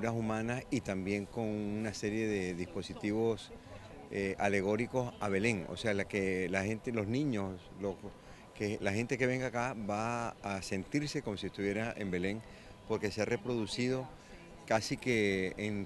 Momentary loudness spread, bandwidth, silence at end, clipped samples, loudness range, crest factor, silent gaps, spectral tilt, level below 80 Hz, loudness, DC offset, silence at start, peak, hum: 10 LU; 12 kHz; 0 s; under 0.1%; 3 LU; 22 dB; none; -5.5 dB/octave; -58 dBFS; -35 LUFS; under 0.1%; 0 s; -14 dBFS; none